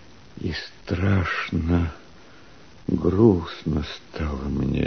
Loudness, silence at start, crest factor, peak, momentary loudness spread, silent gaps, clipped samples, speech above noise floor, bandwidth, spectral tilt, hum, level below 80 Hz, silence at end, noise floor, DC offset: -24 LUFS; 0.35 s; 20 dB; -4 dBFS; 13 LU; none; under 0.1%; 27 dB; 6.6 kHz; -8 dB/octave; none; -38 dBFS; 0 s; -49 dBFS; 0.4%